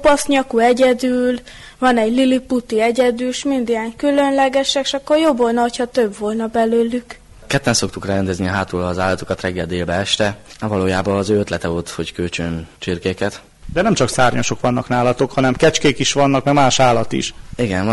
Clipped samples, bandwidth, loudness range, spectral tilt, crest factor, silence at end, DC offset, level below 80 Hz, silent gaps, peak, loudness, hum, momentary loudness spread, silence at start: under 0.1%; 11.5 kHz; 4 LU; -4.5 dB/octave; 14 dB; 0 s; under 0.1%; -42 dBFS; none; -4 dBFS; -17 LUFS; none; 9 LU; 0 s